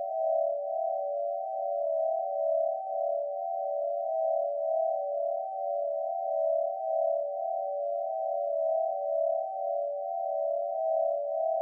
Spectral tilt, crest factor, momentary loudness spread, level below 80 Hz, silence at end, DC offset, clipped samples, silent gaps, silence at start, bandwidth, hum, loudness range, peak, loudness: 24 dB/octave; 12 dB; 4 LU; under -90 dBFS; 0 s; under 0.1%; under 0.1%; none; 0 s; 0.9 kHz; none; 1 LU; -18 dBFS; -31 LUFS